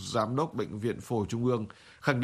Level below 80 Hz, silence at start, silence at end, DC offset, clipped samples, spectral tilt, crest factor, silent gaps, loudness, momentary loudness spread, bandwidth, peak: -60 dBFS; 0 s; 0 s; under 0.1%; under 0.1%; -6 dB/octave; 20 dB; none; -32 LUFS; 4 LU; 14.5 kHz; -10 dBFS